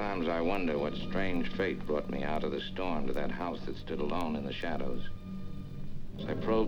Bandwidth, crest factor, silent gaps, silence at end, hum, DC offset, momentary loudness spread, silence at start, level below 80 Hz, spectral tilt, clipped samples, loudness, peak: 6.4 kHz; 16 dB; none; 0 s; none; under 0.1%; 12 LU; 0 s; -42 dBFS; -7 dB/octave; under 0.1%; -35 LUFS; -16 dBFS